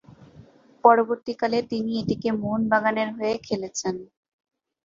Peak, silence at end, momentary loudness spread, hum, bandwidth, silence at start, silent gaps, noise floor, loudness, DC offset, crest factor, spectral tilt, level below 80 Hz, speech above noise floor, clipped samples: -2 dBFS; 0.8 s; 11 LU; none; 7.6 kHz; 0.1 s; none; -51 dBFS; -24 LUFS; under 0.1%; 22 dB; -5 dB/octave; -60 dBFS; 28 dB; under 0.1%